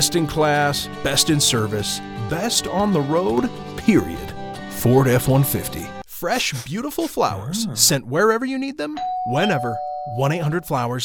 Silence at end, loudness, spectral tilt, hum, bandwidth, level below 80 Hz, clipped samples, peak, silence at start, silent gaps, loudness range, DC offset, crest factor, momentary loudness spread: 0 s; -20 LUFS; -4 dB/octave; none; 19 kHz; -44 dBFS; under 0.1%; 0 dBFS; 0 s; none; 2 LU; under 0.1%; 20 dB; 11 LU